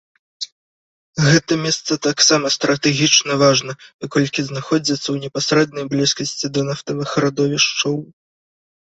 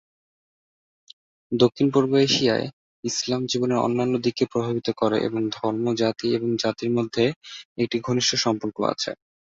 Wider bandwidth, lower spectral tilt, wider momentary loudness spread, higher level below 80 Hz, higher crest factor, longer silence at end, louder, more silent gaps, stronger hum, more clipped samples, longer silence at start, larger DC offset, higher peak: about the same, 8.2 kHz vs 7.8 kHz; about the same, -3.5 dB/octave vs -4.5 dB/octave; first, 12 LU vs 9 LU; first, -56 dBFS vs -62 dBFS; about the same, 18 dB vs 20 dB; first, 0.75 s vs 0.3 s; first, -17 LUFS vs -23 LUFS; first, 0.52-1.13 s, 3.94-3.99 s vs 2.73-3.03 s, 7.36-7.41 s, 7.65-7.76 s; neither; neither; second, 0.4 s vs 1.5 s; neither; first, 0 dBFS vs -4 dBFS